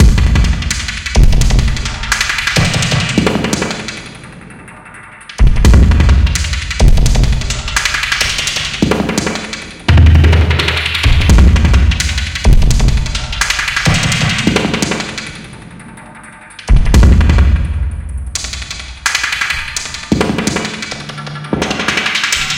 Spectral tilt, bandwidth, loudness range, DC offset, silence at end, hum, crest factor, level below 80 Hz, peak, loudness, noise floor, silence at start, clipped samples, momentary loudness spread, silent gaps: -4.5 dB/octave; 16.5 kHz; 5 LU; under 0.1%; 0 s; none; 12 dB; -14 dBFS; 0 dBFS; -13 LUFS; -34 dBFS; 0 s; under 0.1%; 18 LU; none